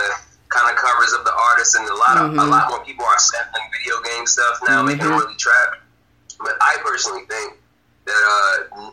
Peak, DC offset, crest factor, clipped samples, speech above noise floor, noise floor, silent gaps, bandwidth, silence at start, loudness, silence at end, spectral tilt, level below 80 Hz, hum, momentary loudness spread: -2 dBFS; under 0.1%; 16 dB; under 0.1%; 28 dB; -45 dBFS; none; 14.5 kHz; 0 s; -16 LUFS; 0 s; -1.5 dB/octave; -58 dBFS; none; 11 LU